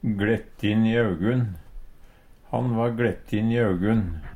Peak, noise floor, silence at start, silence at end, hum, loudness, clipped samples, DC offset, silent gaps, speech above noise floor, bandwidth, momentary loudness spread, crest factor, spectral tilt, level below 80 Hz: -8 dBFS; -49 dBFS; 0.05 s; 0 s; none; -24 LUFS; under 0.1%; under 0.1%; none; 26 dB; 10.5 kHz; 6 LU; 16 dB; -8.5 dB/octave; -42 dBFS